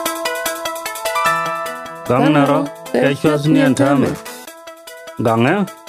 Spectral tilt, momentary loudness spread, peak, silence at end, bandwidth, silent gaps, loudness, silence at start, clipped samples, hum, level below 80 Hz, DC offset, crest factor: -5.5 dB/octave; 19 LU; 0 dBFS; 0 s; 16 kHz; none; -16 LUFS; 0 s; under 0.1%; none; -54 dBFS; under 0.1%; 16 dB